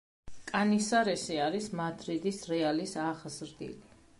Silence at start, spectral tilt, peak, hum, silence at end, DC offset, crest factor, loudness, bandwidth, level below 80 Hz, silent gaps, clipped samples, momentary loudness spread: 0.25 s; -4.5 dB/octave; -14 dBFS; none; 0.4 s; under 0.1%; 18 dB; -32 LUFS; 11.5 kHz; -64 dBFS; none; under 0.1%; 16 LU